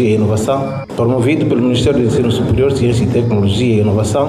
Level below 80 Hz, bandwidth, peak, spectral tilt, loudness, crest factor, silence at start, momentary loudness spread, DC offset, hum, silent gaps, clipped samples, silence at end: -34 dBFS; 13 kHz; -4 dBFS; -7 dB/octave; -14 LUFS; 10 dB; 0 s; 3 LU; under 0.1%; none; none; under 0.1%; 0 s